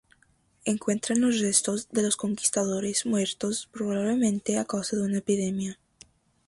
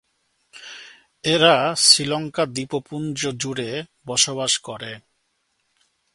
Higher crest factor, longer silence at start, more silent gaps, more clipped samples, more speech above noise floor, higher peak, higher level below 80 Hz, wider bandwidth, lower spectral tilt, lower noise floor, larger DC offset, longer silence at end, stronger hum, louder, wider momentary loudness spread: about the same, 20 dB vs 24 dB; about the same, 0.65 s vs 0.55 s; neither; neither; second, 38 dB vs 49 dB; second, -8 dBFS vs 0 dBFS; about the same, -66 dBFS vs -64 dBFS; about the same, 11.5 kHz vs 12 kHz; first, -4 dB/octave vs -2 dB/octave; second, -65 dBFS vs -71 dBFS; neither; second, 0.75 s vs 1.15 s; neither; second, -27 LUFS vs -19 LUFS; second, 7 LU vs 24 LU